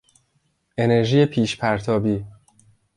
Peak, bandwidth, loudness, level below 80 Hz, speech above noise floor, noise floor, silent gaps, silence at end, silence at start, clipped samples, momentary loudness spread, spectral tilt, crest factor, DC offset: -4 dBFS; 11.5 kHz; -20 LUFS; -52 dBFS; 49 dB; -68 dBFS; none; 0.65 s; 0.8 s; under 0.1%; 12 LU; -6.5 dB/octave; 18 dB; under 0.1%